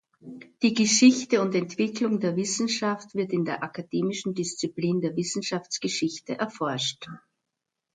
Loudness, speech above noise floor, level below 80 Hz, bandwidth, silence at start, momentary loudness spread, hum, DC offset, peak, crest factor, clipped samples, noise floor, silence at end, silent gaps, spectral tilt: -26 LUFS; 58 dB; -72 dBFS; 9.4 kHz; 0.25 s; 12 LU; none; under 0.1%; -6 dBFS; 20 dB; under 0.1%; -84 dBFS; 0.8 s; none; -4 dB/octave